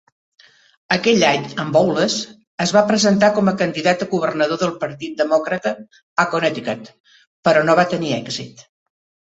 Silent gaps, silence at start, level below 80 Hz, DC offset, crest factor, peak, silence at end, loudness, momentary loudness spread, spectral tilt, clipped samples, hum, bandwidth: 2.47-2.58 s, 6.02-6.16 s, 7.00-7.04 s, 7.27-7.43 s; 0.9 s; -60 dBFS; under 0.1%; 18 dB; -2 dBFS; 0.65 s; -18 LUFS; 12 LU; -4.5 dB/octave; under 0.1%; none; 8.2 kHz